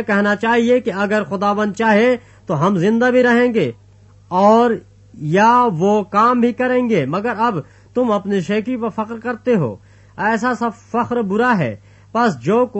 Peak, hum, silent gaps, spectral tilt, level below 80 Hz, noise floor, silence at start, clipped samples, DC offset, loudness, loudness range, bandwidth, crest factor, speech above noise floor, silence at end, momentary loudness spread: -2 dBFS; none; none; -6.5 dB/octave; -56 dBFS; -46 dBFS; 0 s; under 0.1%; under 0.1%; -17 LUFS; 5 LU; 8.4 kHz; 16 dB; 30 dB; 0 s; 10 LU